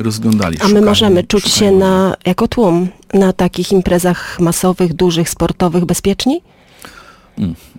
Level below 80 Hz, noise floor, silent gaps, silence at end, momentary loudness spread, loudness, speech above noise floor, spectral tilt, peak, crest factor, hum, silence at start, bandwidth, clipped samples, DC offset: -36 dBFS; -39 dBFS; none; 0.2 s; 7 LU; -13 LUFS; 27 dB; -5 dB/octave; -2 dBFS; 12 dB; none; 0 s; 17 kHz; under 0.1%; under 0.1%